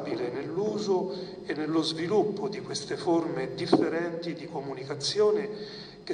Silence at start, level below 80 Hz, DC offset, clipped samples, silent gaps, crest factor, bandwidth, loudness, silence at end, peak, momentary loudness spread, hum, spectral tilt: 0 s; -66 dBFS; under 0.1%; under 0.1%; none; 20 dB; 10 kHz; -29 LUFS; 0 s; -10 dBFS; 11 LU; none; -5 dB/octave